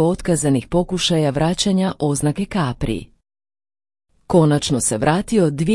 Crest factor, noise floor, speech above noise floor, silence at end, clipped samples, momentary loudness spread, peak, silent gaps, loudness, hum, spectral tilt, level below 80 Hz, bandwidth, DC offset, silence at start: 18 dB; under -90 dBFS; over 72 dB; 0 s; under 0.1%; 5 LU; -2 dBFS; none; -18 LUFS; none; -5 dB/octave; -40 dBFS; 12 kHz; under 0.1%; 0 s